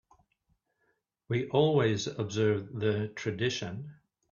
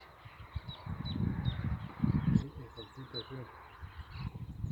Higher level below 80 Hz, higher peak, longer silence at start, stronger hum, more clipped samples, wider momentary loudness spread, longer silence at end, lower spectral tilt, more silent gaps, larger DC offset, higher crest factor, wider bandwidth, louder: second, -68 dBFS vs -48 dBFS; about the same, -12 dBFS vs -14 dBFS; first, 1.3 s vs 0 s; neither; neither; second, 11 LU vs 18 LU; first, 0.4 s vs 0 s; second, -6 dB/octave vs -8 dB/octave; neither; neither; about the same, 20 dB vs 24 dB; about the same, 7.2 kHz vs 7.6 kHz; first, -30 LUFS vs -38 LUFS